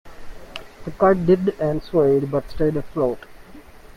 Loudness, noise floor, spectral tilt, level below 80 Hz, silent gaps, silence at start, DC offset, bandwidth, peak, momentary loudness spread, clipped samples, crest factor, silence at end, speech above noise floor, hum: -20 LUFS; -42 dBFS; -8.5 dB/octave; -40 dBFS; none; 0.05 s; under 0.1%; 14 kHz; -4 dBFS; 19 LU; under 0.1%; 18 dB; 0.1 s; 23 dB; none